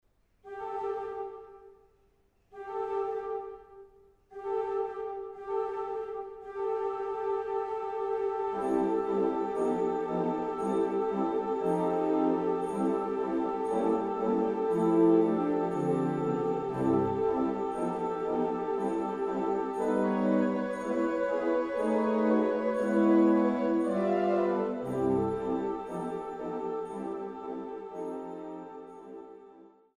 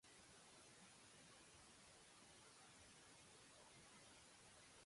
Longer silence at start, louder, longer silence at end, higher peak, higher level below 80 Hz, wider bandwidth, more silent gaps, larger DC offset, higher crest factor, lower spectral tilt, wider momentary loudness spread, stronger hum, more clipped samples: first, 0.45 s vs 0 s; first, -30 LUFS vs -65 LUFS; first, 0.3 s vs 0 s; first, -14 dBFS vs -54 dBFS; first, -64 dBFS vs -84 dBFS; about the same, 11 kHz vs 11.5 kHz; neither; neither; about the same, 16 dB vs 14 dB; first, -8 dB/octave vs -2 dB/octave; first, 13 LU vs 1 LU; neither; neither